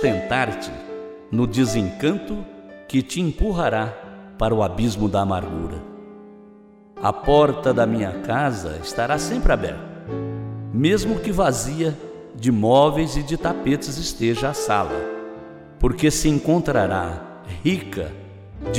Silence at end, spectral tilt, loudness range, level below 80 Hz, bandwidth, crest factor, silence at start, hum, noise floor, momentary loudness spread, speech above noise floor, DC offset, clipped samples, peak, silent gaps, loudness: 0 s; -5.5 dB/octave; 3 LU; -34 dBFS; 16 kHz; 18 dB; 0 s; none; -47 dBFS; 16 LU; 27 dB; under 0.1%; under 0.1%; -4 dBFS; none; -22 LUFS